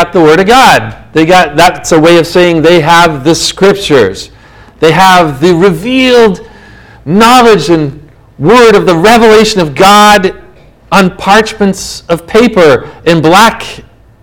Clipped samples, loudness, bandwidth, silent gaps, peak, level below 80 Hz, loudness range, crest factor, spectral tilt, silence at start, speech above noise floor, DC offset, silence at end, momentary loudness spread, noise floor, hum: 20%; -5 LUFS; over 20 kHz; none; 0 dBFS; -34 dBFS; 3 LU; 6 dB; -4.5 dB/octave; 0 s; 32 dB; under 0.1%; 0.4 s; 9 LU; -37 dBFS; none